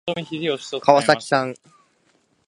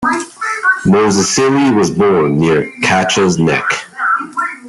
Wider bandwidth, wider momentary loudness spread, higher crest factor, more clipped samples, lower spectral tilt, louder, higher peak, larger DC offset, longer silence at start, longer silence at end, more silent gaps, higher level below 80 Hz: about the same, 11.5 kHz vs 12 kHz; first, 10 LU vs 6 LU; first, 22 dB vs 12 dB; neither; about the same, -4.5 dB/octave vs -4.5 dB/octave; second, -20 LUFS vs -13 LUFS; about the same, 0 dBFS vs 0 dBFS; neither; about the same, 0.05 s vs 0 s; first, 0.95 s vs 0 s; neither; second, -66 dBFS vs -48 dBFS